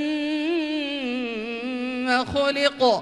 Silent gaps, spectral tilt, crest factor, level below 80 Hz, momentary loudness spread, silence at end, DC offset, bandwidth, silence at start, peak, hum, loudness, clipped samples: none; -4 dB/octave; 16 dB; -54 dBFS; 8 LU; 0 s; under 0.1%; 11.5 kHz; 0 s; -6 dBFS; none; -24 LUFS; under 0.1%